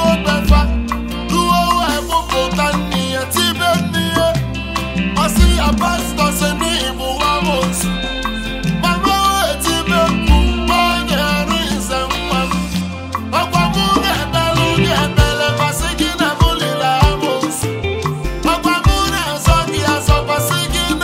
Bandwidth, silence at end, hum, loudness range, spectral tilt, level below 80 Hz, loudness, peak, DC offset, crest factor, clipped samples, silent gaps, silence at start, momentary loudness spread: 16.5 kHz; 0 s; none; 2 LU; -4.5 dB/octave; -22 dBFS; -15 LUFS; 0 dBFS; under 0.1%; 14 dB; under 0.1%; none; 0 s; 6 LU